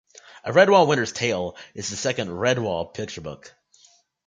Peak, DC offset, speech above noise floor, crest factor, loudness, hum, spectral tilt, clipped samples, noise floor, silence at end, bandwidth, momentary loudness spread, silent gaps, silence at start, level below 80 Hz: -4 dBFS; under 0.1%; 36 dB; 20 dB; -22 LUFS; none; -4 dB/octave; under 0.1%; -58 dBFS; 0.8 s; 9.4 kHz; 19 LU; none; 0.35 s; -56 dBFS